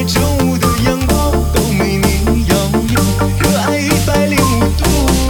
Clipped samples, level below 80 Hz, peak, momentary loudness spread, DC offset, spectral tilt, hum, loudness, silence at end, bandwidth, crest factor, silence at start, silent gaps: under 0.1%; -20 dBFS; 0 dBFS; 2 LU; under 0.1%; -5 dB/octave; none; -13 LUFS; 0 s; 19.5 kHz; 12 dB; 0 s; none